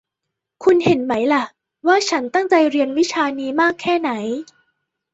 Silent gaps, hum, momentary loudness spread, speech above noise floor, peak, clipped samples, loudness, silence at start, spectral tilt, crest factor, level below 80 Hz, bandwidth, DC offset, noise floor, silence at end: none; none; 8 LU; 63 dB; -2 dBFS; under 0.1%; -18 LUFS; 0.6 s; -4.5 dB/octave; 16 dB; -62 dBFS; 8 kHz; under 0.1%; -81 dBFS; 0.7 s